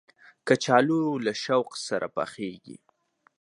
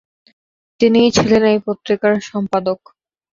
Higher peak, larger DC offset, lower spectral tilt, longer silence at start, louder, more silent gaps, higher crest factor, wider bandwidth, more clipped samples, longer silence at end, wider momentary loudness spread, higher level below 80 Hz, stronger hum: second, -4 dBFS vs 0 dBFS; neither; about the same, -5 dB/octave vs -5 dB/octave; second, 0.45 s vs 0.8 s; second, -26 LUFS vs -15 LUFS; neither; first, 22 dB vs 16 dB; first, 11.5 kHz vs 7.6 kHz; neither; about the same, 0.65 s vs 0.6 s; first, 15 LU vs 8 LU; second, -74 dBFS vs -50 dBFS; neither